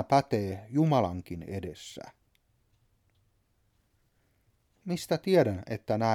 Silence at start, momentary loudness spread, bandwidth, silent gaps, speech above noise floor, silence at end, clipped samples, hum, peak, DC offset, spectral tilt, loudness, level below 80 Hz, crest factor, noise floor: 0 s; 18 LU; 16 kHz; none; 43 dB; 0 s; under 0.1%; none; -12 dBFS; under 0.1%; -7 dB/octave; -29 LUFS; -62 dBFS; 20 dB; -71 dBFS